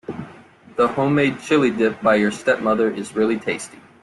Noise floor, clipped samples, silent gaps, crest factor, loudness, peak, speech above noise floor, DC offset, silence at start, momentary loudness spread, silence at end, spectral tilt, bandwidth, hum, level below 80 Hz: -45 dBFS; under 0.1%; none; 16 dB; -19 LUFS; -4 dBFS; 26 dB; under 0.1%; 0.1 s; 15 LU; 0.35 s; -5.5 dB/octave; 12 kHz; none; -60 dBFS